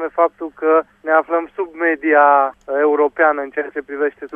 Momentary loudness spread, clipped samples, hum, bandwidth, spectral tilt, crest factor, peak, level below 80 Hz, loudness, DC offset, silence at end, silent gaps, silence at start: 10 LU; under 0.1%; none; 3.6 kHz; -6.5 dB/octave; 16 dB; 0 dBFS; -62 dBFS; -17 LUFS; under 0.1%; 0 s; none; 0 s